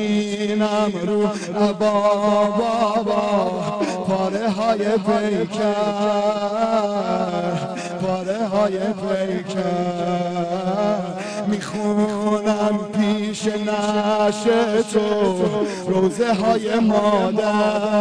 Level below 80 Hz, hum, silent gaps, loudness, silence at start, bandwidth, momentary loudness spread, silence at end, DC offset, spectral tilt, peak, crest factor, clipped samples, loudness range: -56 dBFS; none; none; -20 LUFS; 0 s; 10.5 kHz; 5 LU; 0 s; 0.2%; -6 dB/octave; -8 dBFS; 12 dB; under 0.1%; 3 LU